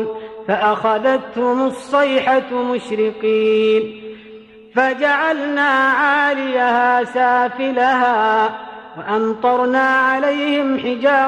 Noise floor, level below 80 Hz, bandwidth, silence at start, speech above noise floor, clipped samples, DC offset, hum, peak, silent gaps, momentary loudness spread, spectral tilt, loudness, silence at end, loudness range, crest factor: -40 dBFS; -62 dBFS; 11 kHz; 0 s; 24 dB; under 0.1%; under 0.1%; none; -4 dBFS; none; 7 LU; -5 dB/octave; -16 LUFS; 0 s; 3 LU; 14 dB